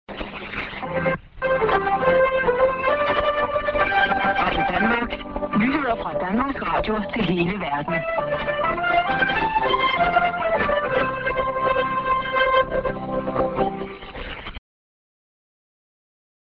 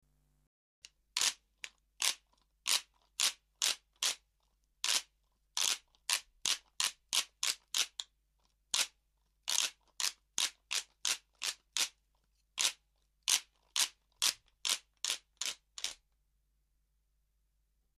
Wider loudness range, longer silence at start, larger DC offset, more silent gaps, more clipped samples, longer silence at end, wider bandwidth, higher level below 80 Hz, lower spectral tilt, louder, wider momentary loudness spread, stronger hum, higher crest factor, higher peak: about the same, 4 LU vs 2 LU; second, 0.1 s vs 1.15 s; neither; neither; neither; second, 1.85 s vs 2.05 s; second, 5.8 kHz vs 15.5 kHz; first, -42 dBFS vs -76 dBFS; first, -8 dB/octave vs 3.5 dB/octave; first, -21 LUFS vs -35 LUFS; about the same, 10 LU vs 9 LU; neither; second, 16 dB vs 30 dB; first, -6 dBFS vs -10 dBFS